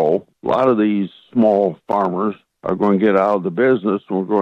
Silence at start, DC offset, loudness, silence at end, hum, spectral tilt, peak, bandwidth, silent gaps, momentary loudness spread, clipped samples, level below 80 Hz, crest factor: 0 s; under 0.1%; -18 LUFS; 0 s; none; -9 dB/octave; -4 dBFS; 6.4 kHz; none; 8 LU; under 0.1%; -60 dBFS; 14 dB